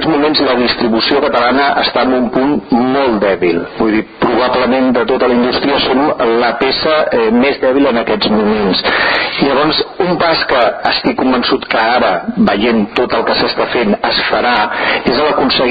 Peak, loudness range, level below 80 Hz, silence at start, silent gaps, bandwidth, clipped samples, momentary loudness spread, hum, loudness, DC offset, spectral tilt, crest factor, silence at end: 0 dBFS; 1 LU; -40 dBFS; 0 s; none; 5 kHz; under 0.1%; 2 LU; none; -12 LUFS; under 0.1%; -7.5 dB/octave; 12 dB; 0 s